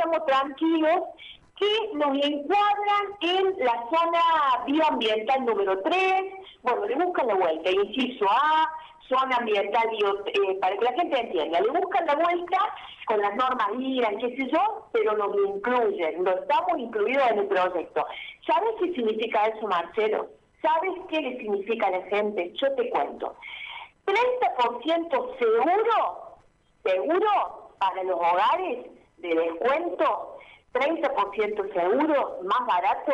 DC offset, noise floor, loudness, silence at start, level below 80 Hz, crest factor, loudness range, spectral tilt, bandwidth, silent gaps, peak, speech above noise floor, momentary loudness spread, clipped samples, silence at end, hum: under 0.1%; -60 dBFS; -25 LUFS; 0 s; -66 dBFS; 12 dB; 3 LU; -4.5 dB/octave; 9.2 kHz; none; -14 dBFS; 35 dB; 7 LU; under 0.1%; 0 s; none